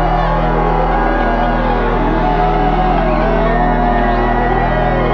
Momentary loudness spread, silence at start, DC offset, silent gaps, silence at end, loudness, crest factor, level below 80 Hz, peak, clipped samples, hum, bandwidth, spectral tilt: 1 LU; 0 s; under 0.1%; none; 0 s; -14 LUFS; 12 dB; -18 dBFS; 0 dBFS; under 0.1%; none; 5.8 kHz; -8.5 dB/octave